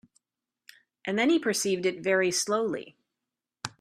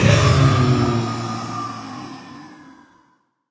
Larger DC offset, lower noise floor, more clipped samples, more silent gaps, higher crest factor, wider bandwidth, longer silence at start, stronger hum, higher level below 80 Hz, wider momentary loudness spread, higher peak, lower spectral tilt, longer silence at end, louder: neither; first, -88 dBFS vs -61 dBFS; neither; neither; about the same, 18 dB vs 20 dB; first, 15.5 kHz vs 8 kHz; first, 1.05 s vs 0 s; neither; second, -74 dBFS vs -34 dBFS; second, 15 LU vs 23 LU; second, -12 dBFS vs 0 dBFS; second, -3 dB/octave vs -6 dB/octave; second, 0.1 s vs 0.95 s; second, -27 LUFS vs -18 LUFS